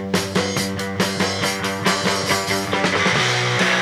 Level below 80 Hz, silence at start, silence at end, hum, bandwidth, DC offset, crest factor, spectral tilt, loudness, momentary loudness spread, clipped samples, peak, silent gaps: -54 dBFS; 0 s; 0 s; none; 16 kHz; under 0.1%; 16 dB; -3.5 dB/octave; -19 LUFS; 5 LU; under 0.1%; -4 dBFS; none